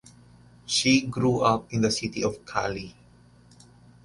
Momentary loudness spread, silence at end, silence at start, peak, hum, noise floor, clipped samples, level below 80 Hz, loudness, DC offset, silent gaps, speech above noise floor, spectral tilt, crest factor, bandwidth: 14 LU; 1.15 s; 0.65 s; -6 dBFS; 60 Hz at -50 dBFS; -55 dBFS; under 0.1%; -54 dBFS; -25 LUFS; under 0.1%; none; 30 dB; -4.5 dB/octave; 20 dB; 11.5 kHz